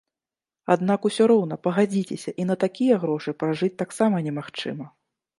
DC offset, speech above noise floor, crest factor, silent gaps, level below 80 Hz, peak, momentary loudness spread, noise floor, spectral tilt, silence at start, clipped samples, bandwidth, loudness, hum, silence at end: under 0.1%; over 67 dB; 20 dB; none; -72 dBFS; -4 dBFS; 12 LU; under -90 dBFS; -6.5 dB/octave; 0.7 s; under 0.1%; 11.5 kHz; -23 LUFS; none; 0.5 s